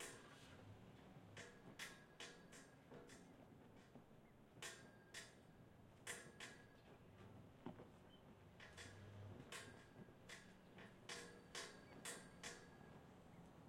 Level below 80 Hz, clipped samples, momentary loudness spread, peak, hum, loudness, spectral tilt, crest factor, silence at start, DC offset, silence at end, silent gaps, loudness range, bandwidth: -80 dBFS; under 0.1%; 12 LU; -38 dBFS; none; -60 LUFS; -3 dB/octave; 22 dB; 0 s; under 0.1%; 0 s; none; 4 LU; 16 kHz